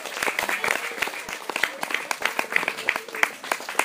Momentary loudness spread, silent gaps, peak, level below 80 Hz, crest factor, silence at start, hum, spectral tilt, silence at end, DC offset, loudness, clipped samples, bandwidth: 5 LU; none; -2 dBFS; -64 dBFS; 26 dB; 0 s; none; -0.5 dB/octave; 0 s; under 0.1%; -25 LUFS; under 0.1%; 16 kHz